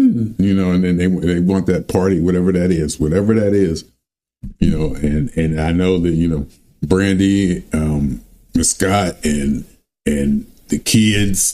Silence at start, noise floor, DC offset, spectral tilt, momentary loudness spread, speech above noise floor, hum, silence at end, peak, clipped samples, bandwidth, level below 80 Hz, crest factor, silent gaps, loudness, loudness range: 0 s; -48 dBFS; under 0.1%; -5.5 dB/octave; 8 LU; 33 dB; none; 0 s; 0 dBFS; under 0.1%; 15 kHz; -32 dBFS; 16 dB; none; -17 LUFS; 3 LU